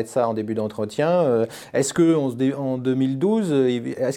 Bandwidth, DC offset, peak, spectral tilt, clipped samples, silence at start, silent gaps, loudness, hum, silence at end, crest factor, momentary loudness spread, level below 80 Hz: 15 kHz; under 0.1%; -6 dBFS; -6 dB/octave; under 0.1%; 0 s; none; -22 LUFS; none; 0 s; 14 dB; 6 LU; -64 dBFS